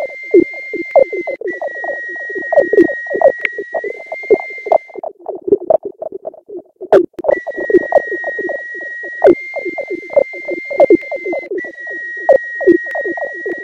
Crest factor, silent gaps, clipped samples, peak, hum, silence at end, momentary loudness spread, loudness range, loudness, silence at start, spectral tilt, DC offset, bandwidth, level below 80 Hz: 16 dB; none; under 0.1%; 0 dBFS; none; 0 s; 12 LU; 2 LU; -15 LUFS; 0 s; -7 dB/octave; under 0.1%; 7.2 kHz; -54 dBFS